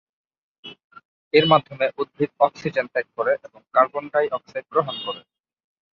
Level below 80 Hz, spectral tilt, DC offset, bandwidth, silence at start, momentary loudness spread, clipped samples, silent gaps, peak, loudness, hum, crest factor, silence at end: -66 dBFS; -6.5 dB/octave; under 0.1%; 7 kHz; 0.65 s; 16 LU; under 0.1%; 0.84-0.90 s, 1.05-1.31 s; -2 dBFS; -22 LUFS; none; 22 dB; 0.75 s